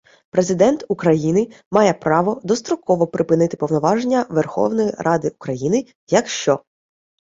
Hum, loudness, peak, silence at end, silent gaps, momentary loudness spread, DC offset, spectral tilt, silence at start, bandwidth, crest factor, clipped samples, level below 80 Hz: none; -19 LUFS; -2 dBFS; 0.8 s; 1.66-1.71 s, 5.95-6.07 s; 5 LU; under 0.1%; -6 dB/octave; 0.35 s; 8 kHz; 16 dB; under 0.1%; -58 dBFS